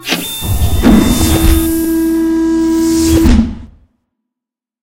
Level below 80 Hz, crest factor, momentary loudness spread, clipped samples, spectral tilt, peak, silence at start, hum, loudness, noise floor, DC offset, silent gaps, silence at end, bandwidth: -18 dBFS; 12 dB; 7 LU; 0.3%; -5.5 dB/octave; 0 dBFS; 0 s; none; -11 LUFS; -84 dBFS; under 0.1%; none; 1.15 s; 17 kHz